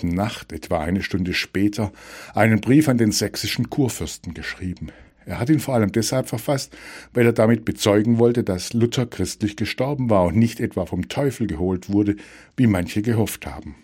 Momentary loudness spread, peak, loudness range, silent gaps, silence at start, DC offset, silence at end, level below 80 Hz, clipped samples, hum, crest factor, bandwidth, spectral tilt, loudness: 13 LU; -2 dBFS; 3 LU; none; 0 s; under 0.1%; 0.1 s; -46 dBFS; under 0.1%; none; 20 dB; 16.5 kHz; -5.5 dB/octave; -21 LUFS